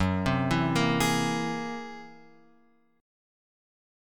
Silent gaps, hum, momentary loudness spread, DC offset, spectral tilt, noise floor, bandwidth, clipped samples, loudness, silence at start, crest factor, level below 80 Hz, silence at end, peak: none; none; 15 LU; under 0.1%; -5 dB/octave; -65 dBFS; 17.5 kHz; under 0.1%; -27 LUFS; 0 s; 20 dB; -52 dBFS; 1.8 s; -10 dBFS